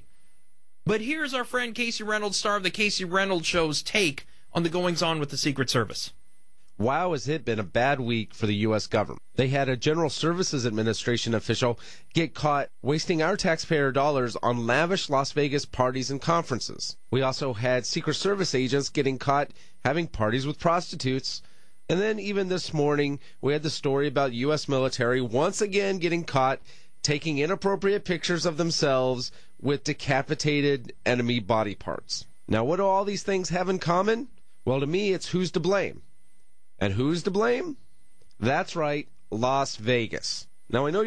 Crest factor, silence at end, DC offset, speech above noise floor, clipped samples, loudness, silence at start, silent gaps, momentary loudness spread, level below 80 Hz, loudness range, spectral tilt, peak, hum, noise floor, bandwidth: 18 dB; 0 s; 1%; 44 dB; under 0.1%; -26 LUFS; 0.85 s; none; 6 LU; -54 dBFS; 2 LU; -4.5 dB/octave; -8 dBFS; none; -71 dBFS; 11 kHz